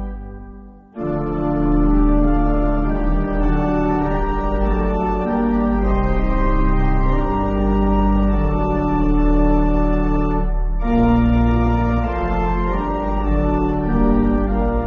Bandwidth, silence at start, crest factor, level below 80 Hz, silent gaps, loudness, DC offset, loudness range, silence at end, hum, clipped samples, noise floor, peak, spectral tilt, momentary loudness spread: 4 kHz; 0 s; 12 dB; -20 dBFS; none; -19 LUFS; under 0.1%; 2 LU; 0 s; none; under 0.1%; -38 dBFS; -4 dBFS; -8.5 dB/octave; 5 LU